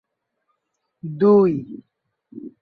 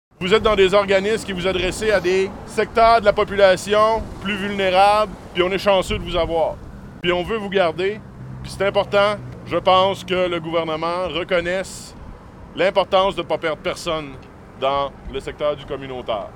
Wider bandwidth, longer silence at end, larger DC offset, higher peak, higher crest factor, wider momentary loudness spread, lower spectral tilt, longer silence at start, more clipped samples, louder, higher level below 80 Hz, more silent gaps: second, 4.8 kHz vs 16.5 kHz; first, 0.15 s vs 0 s; neither; second, -4 dBFS vs 0 dBFS; about the same, 18 dB vs 18 dB; first, 25 LU vs 14 LU; first, -11 dB/octave vs -4.5 dB/octave; first, 1.05 s vs 0.2 s; neither; about the same, -17 LUFS vs -19 LUFS; second, -64 dBFS vs -40 dBFS; neither